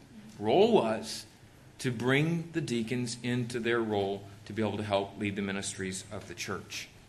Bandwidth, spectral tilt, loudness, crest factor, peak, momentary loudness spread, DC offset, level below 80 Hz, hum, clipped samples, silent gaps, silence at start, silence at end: 13 kHz; -5 dB/octave; -31 LUFS; 20 dB; -12 dBFS; 14 LU; under 0.1%; -64 dBFS; none; under 0.1%; none; 0 s; 0.05 s